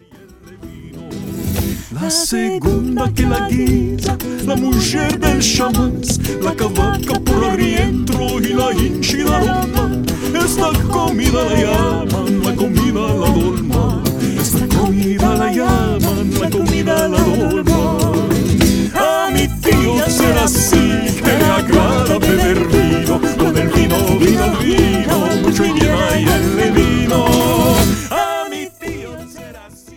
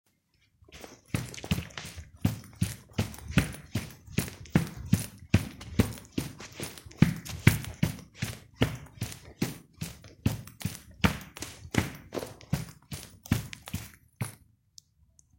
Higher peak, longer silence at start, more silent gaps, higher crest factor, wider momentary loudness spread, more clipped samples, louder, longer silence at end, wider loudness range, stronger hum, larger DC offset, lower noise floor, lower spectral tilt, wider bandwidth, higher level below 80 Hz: first, 0 dBFS vs -4 dBFS; second, 0.15 s vs 0.7 s; neither; second, 14 dB vs 30 dB; second, 6 LU vs 14 LU; neither; first, -15 LUFS vs -33 LUFS; second, 0 s vs 1.05 s; second, 3 LU vs 6 LU; neither; neither; second, -41 dBFS vs -70 dBFS; about the same, -5 dB/octave vs -5.5 dB/octave; first, 19 kHz vs 16.5 kHz; first, -24 dBFS vs -48 dBFS